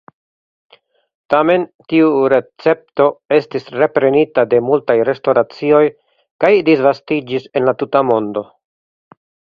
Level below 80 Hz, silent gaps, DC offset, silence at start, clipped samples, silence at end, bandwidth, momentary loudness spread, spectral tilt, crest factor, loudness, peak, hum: -60 dBFS; 1.75-1.79 s, 6.31-6.39 s; under 0.1%; 1.3 s; under 0.1%; 1.1 s; 6 kHz; 6 LU; -8 dB/octave; 16 dB; -15 LUFS; 0 dBFS; none